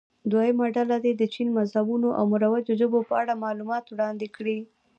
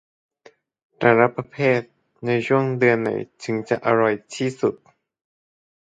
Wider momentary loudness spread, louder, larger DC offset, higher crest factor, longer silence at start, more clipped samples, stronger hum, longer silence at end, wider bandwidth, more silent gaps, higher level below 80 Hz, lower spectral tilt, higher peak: about the same, 8 LU vs 9 LU; second, -25 LUFS vs -21 LUFS; neither; second, 14 dB vs 22 dB; second, 0.25 s vs 1 s; neither; neither; second, 0.35 s vs 1.1 s; second, 7 kHz vs 9.2 kHz; neither; second, -76 dBFS vs -66 dBFS; first, -8 dB/octave vs -6.5 dB/octave; second, -10 dBFS vs 0 dBFS